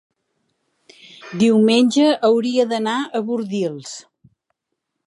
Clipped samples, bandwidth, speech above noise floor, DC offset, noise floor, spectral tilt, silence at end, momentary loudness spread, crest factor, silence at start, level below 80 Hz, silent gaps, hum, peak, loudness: under 0.1%; 11 kHz; 61 dB; under 0.1%; -78 dBFS; -5 dB/octave; 1.05 s; 18 LU; 16 dB; 1.2 s; -68 dBFS; none; none; -4 dBFS; -17 LUFS